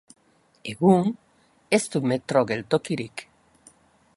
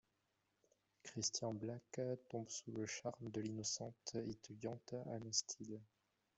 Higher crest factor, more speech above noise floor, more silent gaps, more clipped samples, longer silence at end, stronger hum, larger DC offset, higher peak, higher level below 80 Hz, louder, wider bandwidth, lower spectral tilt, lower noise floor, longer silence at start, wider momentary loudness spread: about the same, 22 dB vs 24 dB; second, 34 dB vs 39 dB; neither; neither; first, 0.95 s vs 0.5 s; neither; neither; first, -4 dBFS vs -24 dBFS; first, -64 dBFS vs -82 dBFS; first, -23 LUFS vs -46 LUFS; first, 11.5 kHz vs 8.2 kHz; first, -6 dB/octave vs -3.5 dB/octave; second, -56 dBFS vs -85 dBFS; second, 0.65 s vs 1.05 s; first, 18 LU vs 9 LU